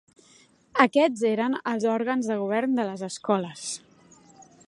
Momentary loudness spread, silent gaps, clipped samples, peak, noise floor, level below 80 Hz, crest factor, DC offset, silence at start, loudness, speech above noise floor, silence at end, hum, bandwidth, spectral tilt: 12 LU; none; under 0.1%; -2 dBFS; -58 dBFS; -76 dBFS; 24 dB; under 0.1%; 0.75 s; -25 LUFS; 33 dB; 0.25 s; none; 11.5 kHz; -4.5 dB/octave